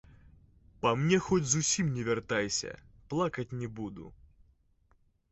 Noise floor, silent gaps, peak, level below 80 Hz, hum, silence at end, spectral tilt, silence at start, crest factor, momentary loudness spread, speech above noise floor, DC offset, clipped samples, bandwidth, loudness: -68 dBFS; none; -12 dBFS; -58 dBFS; none; 1.2 s; -4 dB/octave; 0.85 s; 20 dB; 15 LU; 38 dB; under 0.1%; under 0.1%; 8.2 kHz; -31 LUFS